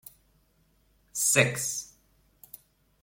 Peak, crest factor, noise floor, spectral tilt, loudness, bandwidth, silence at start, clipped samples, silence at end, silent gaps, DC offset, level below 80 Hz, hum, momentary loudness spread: -8 dBFS; 26 dB; -67 dBFS; -2.5 dB/octave; -26 LUFS; 16.5 kHz; 1.15 s; under 0.1%; 0.45 s; none; under 0.1%; -66 dBFS; none; 26 LU